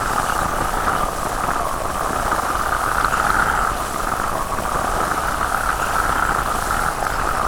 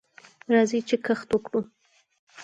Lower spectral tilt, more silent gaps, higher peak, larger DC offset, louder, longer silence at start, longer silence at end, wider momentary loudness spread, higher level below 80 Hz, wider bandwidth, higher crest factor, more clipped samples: second, -3.5 dB/octave vs -5 dB/octave; second, none vs 2.19-2.27 s; about the same, -6 dBFS vs -8 dBFS; neither; first, -20 LUFS vs -25 LUFS; second, 0 s vs 0.5 s; about the same, 0 s vs 0 s; second, 5 LU vs 15 LU; first, -30 dBFS vs -66 dBFS; first, over 20 kHz vs 9.2 kHz; about the same, 14 dB vs 18 dB; neither